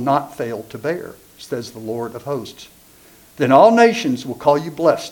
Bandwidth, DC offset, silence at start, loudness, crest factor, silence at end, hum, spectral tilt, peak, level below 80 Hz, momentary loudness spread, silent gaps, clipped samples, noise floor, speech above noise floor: 19 kHz; under 0.1%; 0 s; -18 LUFS; 18 dB; 0 s; none; -5.5 dB/octave; 0 dBFS; -60 dBFS; 17 LU; none; under 0.1%; -48 dBFS; 30 dB